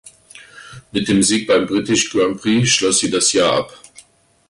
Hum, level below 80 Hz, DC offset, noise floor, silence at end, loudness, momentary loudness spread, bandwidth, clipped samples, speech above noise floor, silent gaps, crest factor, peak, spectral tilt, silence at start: none; -50 dBFS; under 0.1%; -52 dBFS; 0.75 s; -16 LUFS; 8 LU; 11.5 kHz; under 0.1%; 36 dB; none; 14 dB; -4 dBFS; -3 dB/octave; 0.35 s